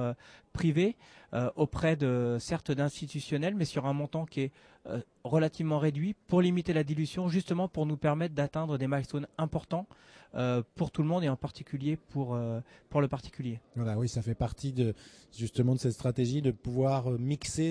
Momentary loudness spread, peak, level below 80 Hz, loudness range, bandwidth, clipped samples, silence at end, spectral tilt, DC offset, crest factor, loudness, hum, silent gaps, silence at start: 10 LU; -14 dBFS; -56 dBFS; 3 LU; 11 kHz; under 0.1%; 0 s; -7 dB/octave; under 0.1%; 18 dB; -32 LUFS; none; none; 0 s